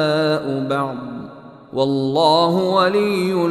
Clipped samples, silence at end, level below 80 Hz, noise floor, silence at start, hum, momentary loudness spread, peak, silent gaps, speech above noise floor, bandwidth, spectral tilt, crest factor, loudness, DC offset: under 0.1%; 0 s; -62 dBFS; -38 dBFS; 0 s; none; 15 LU; -2 dBFS; none; 21 dB; 14 kHz; -6 dB/octave; 16 dB; -18 LUFS; under 0.1%